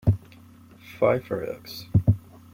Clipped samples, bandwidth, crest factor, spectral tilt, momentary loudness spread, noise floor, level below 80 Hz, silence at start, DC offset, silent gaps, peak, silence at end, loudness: under 0.1%; 16 kHz; 20 dB; -8.5 dB/octave; 12 LU; -50 dBFS; -44 dBFS; 0.05 s; under 0.1%; none; -6 dBFS; 0.35 s; -26 LUFS